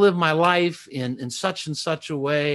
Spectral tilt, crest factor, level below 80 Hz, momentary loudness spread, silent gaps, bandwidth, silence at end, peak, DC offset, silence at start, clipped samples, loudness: -5 dB/octave; 18 dB; -66 dBFS; 10 LU; none; 12.5 kHz; 0 s; -4 dBFS; under 0.1%; 0 s; under 0.1%; -23 LUFS